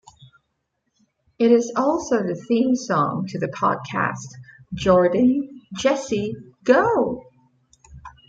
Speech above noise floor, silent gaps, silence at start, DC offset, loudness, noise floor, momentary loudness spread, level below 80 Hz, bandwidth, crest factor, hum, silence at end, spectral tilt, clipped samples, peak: 54 dB; none; 1.4 s; under 0.1%; -21 LUFS; -74 dBFS; 12 LU; -54 dBFS; 7.8 kHz; 20 dB; none; 0.2 s; -6 dB/octave; under 0.1%; -2 dBFS